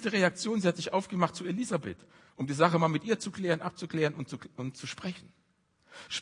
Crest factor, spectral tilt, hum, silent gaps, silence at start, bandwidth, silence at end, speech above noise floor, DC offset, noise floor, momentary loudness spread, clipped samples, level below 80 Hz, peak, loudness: 24 dB; -5 dB/octave; none; none; 0 s; 11 kHz; 0 s; 40 dB; under 0.1%; -71 dBFS; 14 LU; under 0.1%; -74 dBFS; -8 dBFS; -31 LUFS